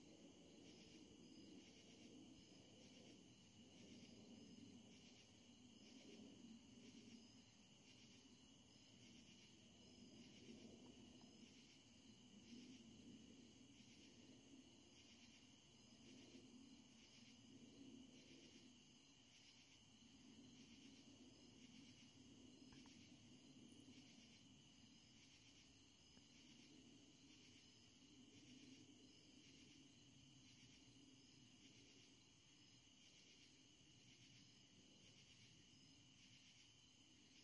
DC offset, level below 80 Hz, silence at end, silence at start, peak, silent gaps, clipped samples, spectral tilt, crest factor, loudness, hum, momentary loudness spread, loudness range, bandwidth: under 0.1%; -88 dBFS; 0 s; 0 s; -50 dBFS; none; under 0.1%; -3.5 dB/octave; 16 dB; -66 LUFS; none; 4 LU; 3 LU; 10.5 kHz